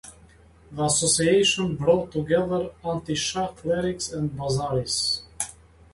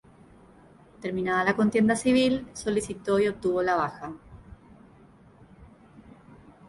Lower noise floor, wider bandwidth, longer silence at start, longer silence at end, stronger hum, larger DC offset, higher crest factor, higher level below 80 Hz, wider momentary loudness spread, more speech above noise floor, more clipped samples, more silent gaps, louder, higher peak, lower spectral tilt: about the same, -52 dBFS vs -54 dBFS; about the same, 11.5 kHz vs 11.5 kHz; second, 0.05 s vs 1 s; second, 0.4 s vs 1.05 s; neither; neither; about the same, 18 dB vs 18 dB; first, -50 dBFS vs -56 dBFS; second, 11 LU vs 14 LU; about the same, 28 dB vs 29 dB; neither; neither; about the same, -24 LUFS vs -25 LUFS; about the same, -8 dBFS vs -10 dBFS; second, -3.5 dB/octave vs -5 dB/octave